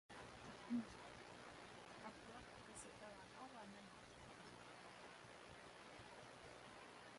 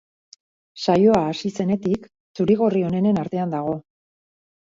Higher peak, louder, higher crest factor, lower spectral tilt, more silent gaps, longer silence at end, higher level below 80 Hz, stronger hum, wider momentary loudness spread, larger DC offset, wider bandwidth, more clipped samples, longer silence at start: second, -36 dBFS vs -4 dBFS; second, -57 LUFS vs -21 LUFS; about the same, 22 dB vs 18 dB; second, -4 dB/octave vs -7.5 dB/octave; second, none vs 2.20-2.35 s; second, 0 s vs 0.95 s; second, -78 dBFS vs -56 dBFS; first, 60 Hz at -75 dBFS vs none; second, 8 LU vs 11 LU; neither; first, 11.5 kHz vs 7.6 kHz; neither; second, 0.1 s vs 0.75 s